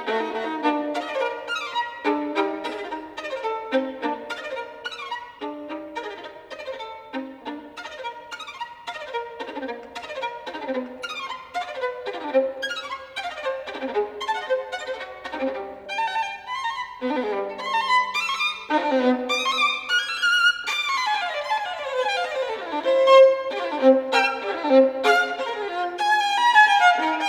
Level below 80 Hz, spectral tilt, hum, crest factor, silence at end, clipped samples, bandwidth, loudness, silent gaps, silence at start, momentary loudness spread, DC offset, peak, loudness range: -66 dBFS; -1.5 dB/octave; none; 20 dB; 0 s; under 0.1%; 14 kHz; -23 LUFS; none; 0 s; 16 LU; under 0.1%; -4 dBFS; 15 LU